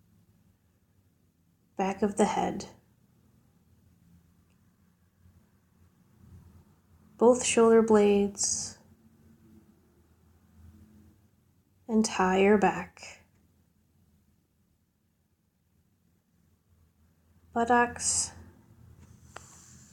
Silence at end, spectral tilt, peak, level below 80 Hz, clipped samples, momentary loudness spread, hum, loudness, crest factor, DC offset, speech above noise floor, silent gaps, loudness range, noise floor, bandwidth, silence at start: 1.5 s; -4 dB/octave; -10 dBFS; -62 dBFS; under 0.1%; 25 LU; none; -26 LUFS; 22 dB; under 0.1%; 47 dB; none; 11 LU; -72 dBFS; 14 kHz; 1.8 s